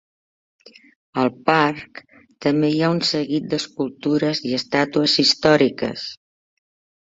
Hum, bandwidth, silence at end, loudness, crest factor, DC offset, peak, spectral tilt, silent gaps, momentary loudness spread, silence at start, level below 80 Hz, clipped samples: none; 7.8 kHz; 0.9 s; -19 LUFS; 22 dB; under 0.1%; 0 dBFS; -5 dB/octave; none; 11 LU; 1.15 s; -60 dBFS; under 0.1%